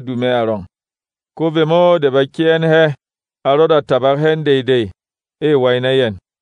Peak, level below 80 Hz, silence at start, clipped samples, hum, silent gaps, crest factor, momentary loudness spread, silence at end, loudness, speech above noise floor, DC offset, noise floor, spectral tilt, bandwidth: -2 dBFS; -60 dBFS; 0 s; under 0.1%; none; none; 14 dB; 9 LU; 0.25 s; -14 LUFS; over 77 dB; under 0.1%; under -90 dBFS; -7.5 dB/octave; 9.2 kHz